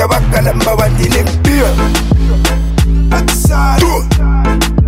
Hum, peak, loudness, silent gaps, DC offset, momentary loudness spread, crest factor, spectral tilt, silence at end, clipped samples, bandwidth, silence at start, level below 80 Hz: none; 0 dBFS; -11 LUFS; none; under 0.1%; 2 LU; 10 dB; -5.5 dB/octave; 0 s; under 0.1%; 16.5 kHz; 0 s; -12 dBFS